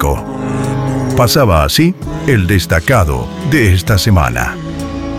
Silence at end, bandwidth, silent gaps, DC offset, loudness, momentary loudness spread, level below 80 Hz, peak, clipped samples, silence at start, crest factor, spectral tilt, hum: 0 s; 16.5 kHz; none; under 0.1%; -13 LUFS; 9 LU; -24 dBFS; 0 dBFS; under 0.1%; 0 s; 12 dB; -5.5 dB/octave; none